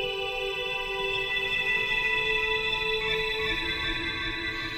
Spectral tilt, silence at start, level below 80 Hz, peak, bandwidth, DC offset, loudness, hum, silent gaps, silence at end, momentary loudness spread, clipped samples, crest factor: -3 dB/octave; 0 s; -44 dBFS; -14 dBFS; 17 kHz; under 0.1%; -26 LUFS; none; none; 0 s; 5 LU; under 0.1%; 14 dB